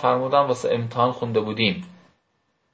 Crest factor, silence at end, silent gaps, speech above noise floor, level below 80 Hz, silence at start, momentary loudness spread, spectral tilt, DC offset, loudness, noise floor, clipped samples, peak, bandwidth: 20 dB; 0.8 s; none; 49 dB; -60 dBFS; 0 s; 5 LU; -6 dB/octave; under 0.1%; -22 LUFS; -70 dBFS; under 0.1%; -4 dBFS; 8 kHz